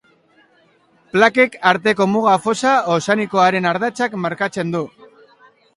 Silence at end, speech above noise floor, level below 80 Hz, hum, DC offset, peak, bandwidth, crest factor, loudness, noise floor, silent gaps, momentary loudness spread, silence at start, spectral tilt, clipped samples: 0.9 s; 40 dB; -64 dBFS; none; under 0.1%; 0 dBFS; 11.5 kHz; 18 dB; -17 LUFS; -56 dBFS; none; 8 LU; 1.15 s; -5 dB/octave; under 0.1%